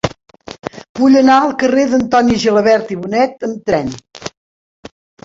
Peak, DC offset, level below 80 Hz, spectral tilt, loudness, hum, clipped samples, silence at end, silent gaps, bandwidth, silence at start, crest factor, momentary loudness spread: -2 dBFS; under 0.1%; -46 dBFS; -5.5 dB/octave; -13 LUFS; none; under 0.1%; 0.95 s; 0.89-0.95 s; 7.8 kHz; 0.05 s; 14 dB; 19 LU